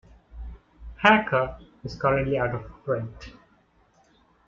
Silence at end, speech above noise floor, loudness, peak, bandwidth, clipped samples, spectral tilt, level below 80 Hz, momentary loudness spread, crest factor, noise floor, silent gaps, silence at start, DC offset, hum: 1.15 s; 38 dB; -24 LUFS; -2 dBFS; 7.4 kHz; under 0.1%; -6.5 dB/octave; -46 dBFS; 25 LU; 24 dB; -62 dBFS; none; 0.35 s; under 0.1%; none